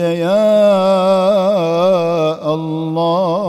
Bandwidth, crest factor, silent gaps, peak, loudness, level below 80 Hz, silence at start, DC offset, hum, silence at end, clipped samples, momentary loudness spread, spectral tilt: 13.5 kHz; 10 dB; none; -2 dBFS; -14 LUFS; -64 dBFS; 0 s; under 0.1%; none; 0 s; under 0.1%; 8 LU; -7 dB/octave